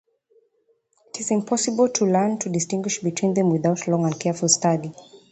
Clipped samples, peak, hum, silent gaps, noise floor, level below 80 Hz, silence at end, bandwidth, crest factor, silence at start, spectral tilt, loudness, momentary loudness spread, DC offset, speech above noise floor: under 0.1%; -2 dBFS; none; none; -66 dBFS; -66 dBFS; 0.15 s; 9 kHz; 20 dB; 1.15 s; -4.5 dB/octave; -22 LUFS; 6 LU; under 0.1%; 45 dB